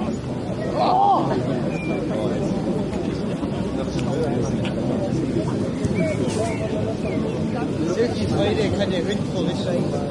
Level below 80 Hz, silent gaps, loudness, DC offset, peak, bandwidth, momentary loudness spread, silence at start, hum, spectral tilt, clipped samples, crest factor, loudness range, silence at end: -42 dBFS; none; -23 LUFS; under 0.1%; -8 dBFS; 11.5 kHz; 5 LU; 0 s; none; -7 dB/octave; under 0.1%; 14 dB; 2 LU; 0 s